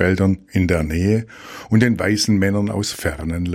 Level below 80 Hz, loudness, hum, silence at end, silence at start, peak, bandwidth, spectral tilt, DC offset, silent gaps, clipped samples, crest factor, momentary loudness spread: -36 dBFS; -19 LUFS; none; 0 s; 0 s; -2 dBFS; 16 kHz; -5.5 dB/octave; under 0.1%; none; under 0.1%; 18 dB; 7 LU